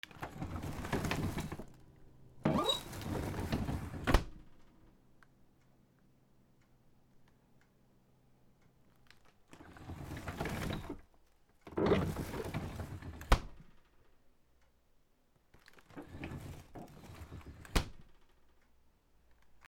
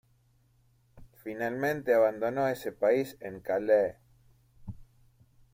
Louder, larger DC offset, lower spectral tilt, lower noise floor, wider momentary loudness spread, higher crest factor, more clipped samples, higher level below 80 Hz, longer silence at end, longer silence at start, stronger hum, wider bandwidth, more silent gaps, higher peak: second, -39 LUFS vs -29 LUFS; neither; about the same, -5.5 dB/octave vs -6.5 dB/octave; first, -71 dBFS vs -67 dBFS; about the same, 20 LU vs 22 LU; first, 32 dB vs 18 dB; neither; first, -48 dBFS vs -62 dBFS; second, 0.05 s vs 0.7 s; second, 0.05 s vs 0.95 s; neither; first, 19.5 kHz vs 16.5 kHz; neither; first, -8 dBFS vs -14 dBFS